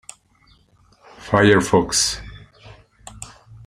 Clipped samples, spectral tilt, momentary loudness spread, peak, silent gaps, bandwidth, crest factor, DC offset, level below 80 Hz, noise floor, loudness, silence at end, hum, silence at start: under 0.1%; -3.5 dB/octave; 25 LU; -2 dBFS; none; 15.5 kHz; 20 dB; under 0.1%; -46 dBFS; -56 dBFS; -17 LUFS; 0.4 s; none; 1.2 s